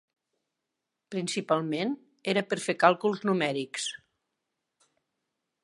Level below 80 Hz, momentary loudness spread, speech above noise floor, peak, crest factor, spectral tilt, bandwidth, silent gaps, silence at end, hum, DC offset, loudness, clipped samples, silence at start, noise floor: -82 dBFS; 12 LU; 57 dB; -6 dBFS; 26 dB; -4.5 dB/octave; 11.5 kHz; none; 1.65 s; none; under 0.1%; -29 LUFS; under 0.1%; 1.1 s; -85 dBFS